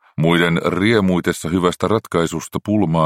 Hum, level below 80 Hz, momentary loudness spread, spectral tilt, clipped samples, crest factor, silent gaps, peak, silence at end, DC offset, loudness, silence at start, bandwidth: none; -46 dBFS; 5 LU; -6 dB/octave; under 0.1%; 16 dB; none; 0 dBFS; 0 s; under 0.1%; -18 LUFS; 0.2 s; 16 kHz